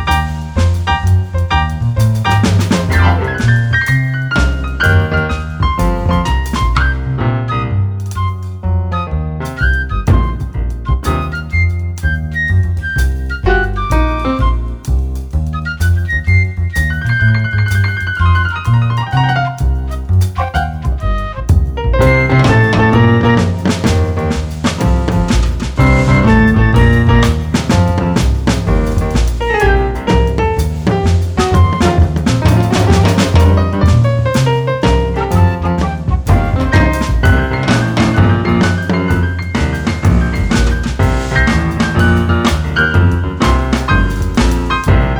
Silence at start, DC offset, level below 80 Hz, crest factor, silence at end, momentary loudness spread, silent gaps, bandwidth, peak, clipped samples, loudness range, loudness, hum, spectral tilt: 0 s; under 0.1%; -18 dBFS; 12 dB; 0 s; 7 LU; none; 19.5 kHz; 0 dBFS; under 0.1%; 5 LU; -13 LUFS; none; -6.5 dB/octave